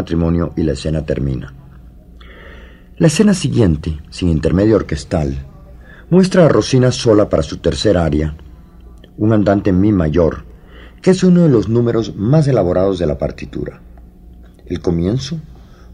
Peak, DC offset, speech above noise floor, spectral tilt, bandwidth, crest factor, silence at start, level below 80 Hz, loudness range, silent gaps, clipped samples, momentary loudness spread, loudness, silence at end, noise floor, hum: 0 dBFS; under 0.1%; 25 dB; -7 dB/octave; 12 kHz; 16 dB; 0 s; -32 dBFS; 4 LU; none; under 0.1%; 14 LU; -15 LUFS; 0 s; -39 dBFS; none